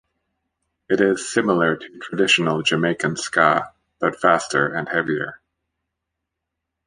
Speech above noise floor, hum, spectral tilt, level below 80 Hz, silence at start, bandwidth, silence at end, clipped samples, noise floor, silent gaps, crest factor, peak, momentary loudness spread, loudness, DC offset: 61 dB; none; -4 dB/octave; -62 dBFS; 0.9 s; 10.5 kHz; 1.5 s; under 0.1%; -81 dBFS; none; 20 dB; -2 dBFS; 9 LU; -20 LUFS; under 0.1%